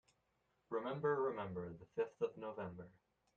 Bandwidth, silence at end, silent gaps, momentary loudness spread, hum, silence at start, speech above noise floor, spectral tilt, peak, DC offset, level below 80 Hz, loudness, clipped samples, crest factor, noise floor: 7 kHz; 0.45 s; none; 12 LU; none; 0.7 s; 39 dB; -8 dB/octave; -26 dBFS; under 0.1%; -78 dBFS; -43 LUFS; under 0.1%; 18 dB; -82 dBFS